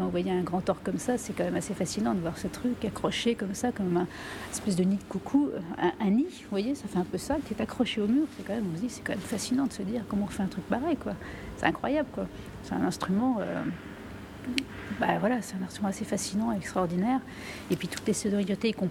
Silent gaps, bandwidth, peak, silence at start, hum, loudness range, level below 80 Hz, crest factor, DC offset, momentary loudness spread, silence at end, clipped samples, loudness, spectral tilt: none; 16.5 kHz; -8 dBFS; 0 s; none; 2 LU; -54 dBFS; 22 dB; under 0.1%; 8 LU; 0 s; under 0.1%; -30 LUFS; -5.5 dB/octave